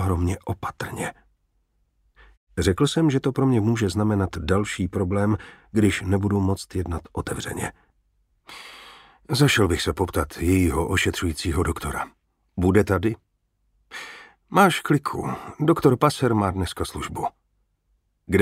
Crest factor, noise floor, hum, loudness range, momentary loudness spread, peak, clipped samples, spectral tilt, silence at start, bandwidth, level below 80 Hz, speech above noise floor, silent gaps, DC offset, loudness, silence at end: 22 dB; -70 dBFS; none; 4 LU; 15 LU; -2 dBFS; under 0.1%; -6 dB/octave; 0 s; 16 kHz; -42 dBFS; 48 dB; 2.37-2.47 s; under 0.1%; -23 LUFS; 0 s